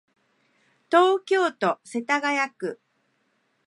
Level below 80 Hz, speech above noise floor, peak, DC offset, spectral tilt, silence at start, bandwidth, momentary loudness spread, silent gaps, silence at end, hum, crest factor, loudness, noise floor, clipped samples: -84 dBFS; 47 dB; -4 dBFS; under 0.1%; -4 dB/octave; 0.9 s; 11.5 kHz; 11 LU; none; 0.9 s; none; 22 dB; -23 LUFS; -70 dBFS; under 0.1%